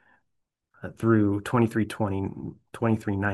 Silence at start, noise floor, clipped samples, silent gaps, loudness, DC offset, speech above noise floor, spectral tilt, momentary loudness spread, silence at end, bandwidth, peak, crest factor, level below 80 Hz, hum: 0.8 s; -79 dBFS; under 0.1%; none; -26 LUFS; under 0.1%; 53 dB; -8 dB/octave; 17 LU; 0 s; 12.5 kHz; -8 dBFS; 18 dB; -62 dBFS; none